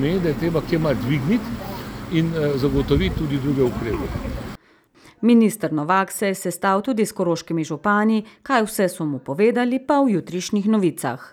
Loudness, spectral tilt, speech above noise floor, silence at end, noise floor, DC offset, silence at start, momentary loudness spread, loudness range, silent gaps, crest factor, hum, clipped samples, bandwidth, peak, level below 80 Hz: -21 LUFS; -6 dB/octave; 33 dB; 0.05 s; -54 dBFS; under 0.1%; 0 s; 8 LU; 2 LU; none; 16 dB; none; under 0.1%; over 20 kHz; -4 dBFS; -38 dBFS